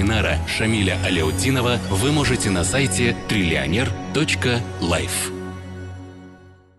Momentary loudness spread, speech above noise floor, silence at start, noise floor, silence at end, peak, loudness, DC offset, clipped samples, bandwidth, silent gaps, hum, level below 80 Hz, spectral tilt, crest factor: 14 LU; 26 dB; 0 s; -46 dBFS; 0.3 s; -8 dBFS; -20 LUFS; under 0.1%; under 0.1%; 12.5 kHz; none; none; -34 dBFS; -4.5 dB/octave; 14 dB